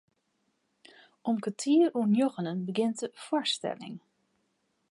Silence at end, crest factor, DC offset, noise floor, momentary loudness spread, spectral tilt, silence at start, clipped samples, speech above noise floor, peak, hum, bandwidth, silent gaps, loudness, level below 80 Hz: 0.95 s; 16 dB; under 0.1%; -76 dBFS; 13 LU; -5 dB/octave; 1.25 s; under 0.1%; 48 dB; -14 dBFS; none; 11.5 kHz; none; -29 LUFS; -86 dBFS